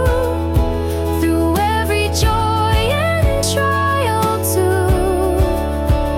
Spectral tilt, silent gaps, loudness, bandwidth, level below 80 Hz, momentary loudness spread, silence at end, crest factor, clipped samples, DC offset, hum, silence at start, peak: -5.5 dB/octave; none; -16 LUFS; 16.5 kHz; -24 dBFS; 2 LU; 0 s; 10 dB; under 0.1%; under 0.1%; none; 0 s; -6 dBFS